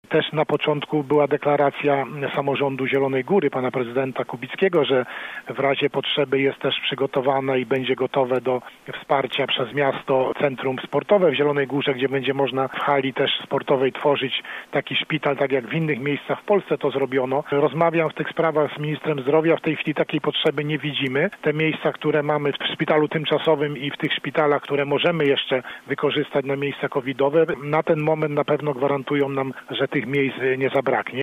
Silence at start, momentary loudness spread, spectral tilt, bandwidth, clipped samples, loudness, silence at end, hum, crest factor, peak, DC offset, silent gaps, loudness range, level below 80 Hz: 0.1 s; 5 LU; -7 dB/octave; 11 kHz; under 0.1%; -22 LUFS; 0 s; none; 16 dB; -4 dBFS; under 0.1%; none; 1 LU; -66 dBFS